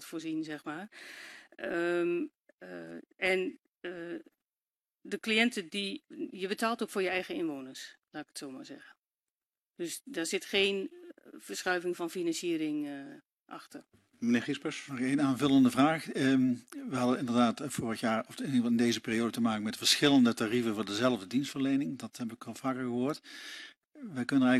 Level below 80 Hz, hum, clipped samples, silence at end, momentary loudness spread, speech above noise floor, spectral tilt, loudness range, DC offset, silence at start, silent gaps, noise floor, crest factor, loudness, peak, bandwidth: -74 dBFS; none; under 0.1%; 0 s; 19 LU; over 58 dB; -4 dB/octave; 8 LU; under 0.1%; 0 s; 2.53-2.58 s, 3.68-3.73 s, 8.98-9.02 s, 9.31-9.35 s, 9.70-9.74 s, 13.41-13.46 s; under -90 dBFS; 20 dB; -31 LUFS; -12 dBFS; 13.5 kHz